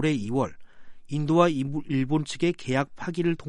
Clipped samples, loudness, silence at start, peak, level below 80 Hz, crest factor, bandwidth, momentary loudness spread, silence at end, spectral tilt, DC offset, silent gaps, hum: under 0.1%; -26 LUFS; 0 s; -6 dBFS; -54 dBFS; 20 dB; 11 kHz; 10 LU; 0 s; -6.5 dB/octave; under 0.1%; none; none